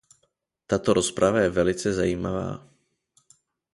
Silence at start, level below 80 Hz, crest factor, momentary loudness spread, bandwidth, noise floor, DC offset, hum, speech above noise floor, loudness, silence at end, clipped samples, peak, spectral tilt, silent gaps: 0.7 s; -48 dBFS; 20 dB; 10 LU; 11.5 kHz; -73 dBFS; under 0.1%; none; 50 dB; -24 LUFS; 1.15 s; under 0.1%; -6 dBFS; -5 dB/octave; none